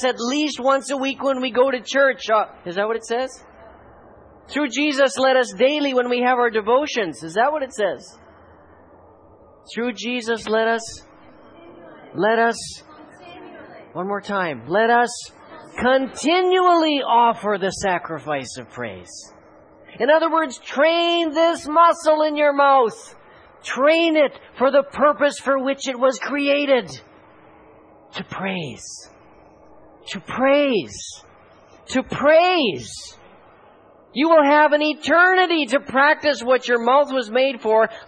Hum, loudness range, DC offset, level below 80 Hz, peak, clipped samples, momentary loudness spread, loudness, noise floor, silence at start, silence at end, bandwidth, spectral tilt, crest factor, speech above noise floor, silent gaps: none; 9 LU; under 0.1%; -60 dBFS; -4 dBFS; under 0.1%; 18 LU; -19 LUFS; -50 dBFS; 0 s; 0 s; 10.5 kHz; -3.5 dB/octave; 16 dB; 31 dB; none